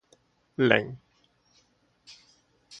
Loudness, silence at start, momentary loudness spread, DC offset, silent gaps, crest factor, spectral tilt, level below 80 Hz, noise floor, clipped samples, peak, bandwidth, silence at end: -25 LUFS; 0.6 s; 28 LU; under 0.1%; none; 28 dB; -6 dB/octave; -68 dBFS; -67 dBFS; under 0.1%; -2 dBFS; 9 kHz; 0.05 s